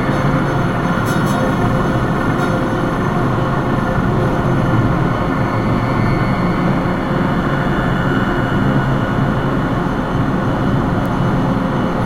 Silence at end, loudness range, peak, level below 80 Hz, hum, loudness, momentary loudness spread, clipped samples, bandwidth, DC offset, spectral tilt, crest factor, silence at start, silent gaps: 0 s; 1 LU; -2 dBFS; -28 dBFS; none; -16 LUFS; 2 LU; under 0.1%; 16 kHz; 0.2%; -7.5 dB/octave; 14 dB; 0 s; none